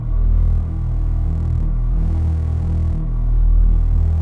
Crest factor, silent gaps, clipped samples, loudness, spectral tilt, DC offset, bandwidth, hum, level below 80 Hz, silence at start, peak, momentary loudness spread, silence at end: 10 dB; none; under 0.1%; -20 LUFS; -10.5 dB/octave; under 0.1%; 2.2 kHz; none; -16 dBFS; 0 s; -6 dBFS; 4 LU; 0 s